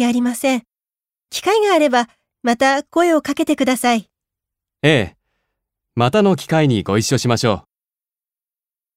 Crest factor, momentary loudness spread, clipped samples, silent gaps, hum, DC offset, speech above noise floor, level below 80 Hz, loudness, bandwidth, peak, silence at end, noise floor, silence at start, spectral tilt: 18 dB; 9 LU; under 0.1%; none; none; under 0.1%; over 74 dB; -54 dBFS; -17 LUFS; 16 kHz; -2 dBFS; 1.35 s; under -90 dBFS; 0 s; -5 dB/octave